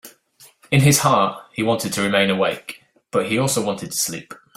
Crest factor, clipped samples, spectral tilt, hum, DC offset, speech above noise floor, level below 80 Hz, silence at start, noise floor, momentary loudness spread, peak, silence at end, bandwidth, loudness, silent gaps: 20 dB; under 0.1%; -4 dB/octave; none; under 0.1%; 32 dB; -52 dBFS; 0.05 s; -52 dBFS; 10 LU; -2 dBFS; 0.2 s; 16 kHz; -19 LUFS; none